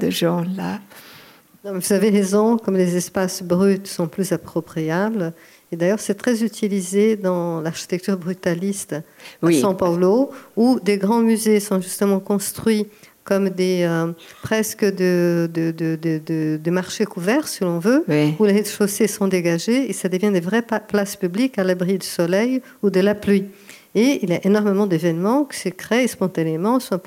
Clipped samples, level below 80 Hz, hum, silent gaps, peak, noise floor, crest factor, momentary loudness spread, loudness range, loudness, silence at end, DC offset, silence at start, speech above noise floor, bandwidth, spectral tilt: under 0.1%; -64 dBFS; none; none; -6 dBFS; -47 dBFS; 14 dB; 8 LU; 3 LU; -20 LUFS; 0.05 s; under 0.1%; 0 s; 28 dB; 16.5 kHz; -5.5 dB/octave